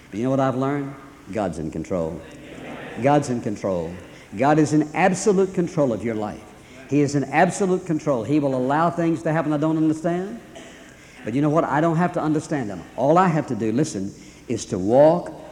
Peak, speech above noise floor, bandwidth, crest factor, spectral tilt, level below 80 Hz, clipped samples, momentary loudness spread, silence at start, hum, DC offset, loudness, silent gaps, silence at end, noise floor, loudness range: -4 dBFS; 23 dB; 11.5 kHz; 18 dB; -6.5 dB/octave; -54 dBFS; under 0.1%; 17 LU; 0.1 s; none; under 0.1%; -22 LUFS; none; 0 s; -44 dBFS; 4 LU